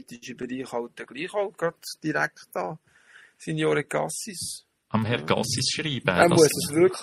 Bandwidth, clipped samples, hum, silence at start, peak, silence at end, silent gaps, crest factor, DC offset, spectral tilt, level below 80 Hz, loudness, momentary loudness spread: 15.5 kHz; under 0.1%; none; 0.1 s; -2 dBFS; 0 s; none; 24 dB; under 0.1%; -4 dB/octave; -62 dBFS; -25 LUFS; 16 LU